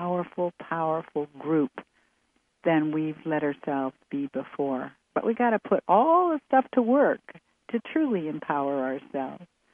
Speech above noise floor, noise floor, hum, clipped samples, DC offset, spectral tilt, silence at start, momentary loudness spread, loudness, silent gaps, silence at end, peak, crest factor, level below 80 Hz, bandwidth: 45 dB; -71 dBFS; none; under 0.1%; under 0.1%; -9.5 dB/octave; 0 s; 12 LU; -27 LUFS; none; 0.3 s; -8 dBFS; 20 dB; -74 dBFS; 3.6 kHz